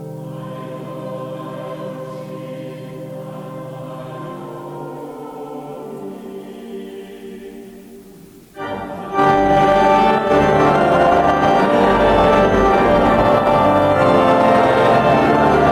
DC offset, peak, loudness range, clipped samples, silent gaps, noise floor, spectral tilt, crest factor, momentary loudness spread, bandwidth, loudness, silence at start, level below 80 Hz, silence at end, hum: under 0.1%; -6 dBFS; 19 LU; under 0.1%; none; -41 dBFS; -6.5 dB/octave; 10 dB; 19 LU; 14 kHz; -13 LUFS; 0 s; -38 dBFS; 0 s; none